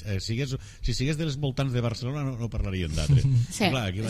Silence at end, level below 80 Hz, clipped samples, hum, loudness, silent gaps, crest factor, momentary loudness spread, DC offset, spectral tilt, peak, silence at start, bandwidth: 0 s; -38 dBFS; under 0.1%; none; -27 LUFS; none; 16 dB; 8 LU; under 0.1%; -6 dB/octave; -10 dBFS; 0 s; 14 kHz